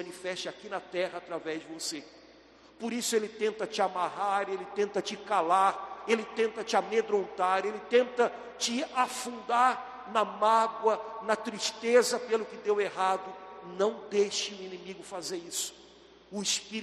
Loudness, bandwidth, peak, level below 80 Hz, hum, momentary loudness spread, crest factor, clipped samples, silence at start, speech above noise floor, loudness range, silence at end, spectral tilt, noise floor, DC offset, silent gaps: -30 LUFS; 13 kHz; -10 dBFS; -74 dBFS; none; 12 LU; 20 dB; under 0.1%; 0 s; 26 dB; 6 LU; 0 s; -2.5 dB/octave; -56 dBFS; under 0.1%; none